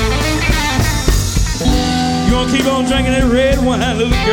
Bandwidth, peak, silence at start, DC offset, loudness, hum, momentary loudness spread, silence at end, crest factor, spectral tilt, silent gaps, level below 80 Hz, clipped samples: 18 kHz; 0 dBFS; 0 s; under 0.1%; -14 LUFS; none; 3 LU; 0 s; 14 dB; -4.5 dB/octave; none; -20 dBFS; under 0.1%